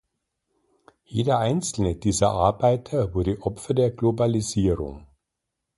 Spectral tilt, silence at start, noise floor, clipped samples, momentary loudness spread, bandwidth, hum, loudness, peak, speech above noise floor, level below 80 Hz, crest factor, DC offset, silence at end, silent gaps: -6 dB/octave; 1.1 s; -82 dBFS; under 0.1%; 6 LU; 11.5 kHz; none; -23 LUFS; -6 dBFS; 59 dB; -42 dBFS; 18 dB; under 0.1%; 0.75 s; none